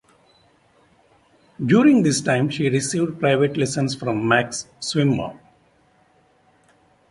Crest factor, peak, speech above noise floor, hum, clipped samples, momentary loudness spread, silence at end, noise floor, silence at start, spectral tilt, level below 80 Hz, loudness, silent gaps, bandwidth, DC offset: 18 dB; -4 dBFS; 39 dB; none; under 0.1%; 11 LU; 1.75 s; -59 dBFS; 1.6 s; -5 dB/octave; -58 dBFS; -20 LUFS; none; 11.5 kHz; under 0.1%